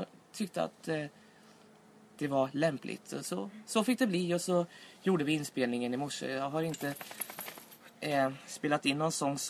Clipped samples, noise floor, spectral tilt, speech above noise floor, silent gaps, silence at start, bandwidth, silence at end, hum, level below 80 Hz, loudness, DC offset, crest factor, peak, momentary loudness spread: under 0.1%; -59 dBFS; -4.5 dB/octave; 26 dB; none; 0 s; 14 kHz; 0 s; none; -78 dBFS; -34 LUFS; under 0.1%; 20 dB; -14 dBFS; 11 LU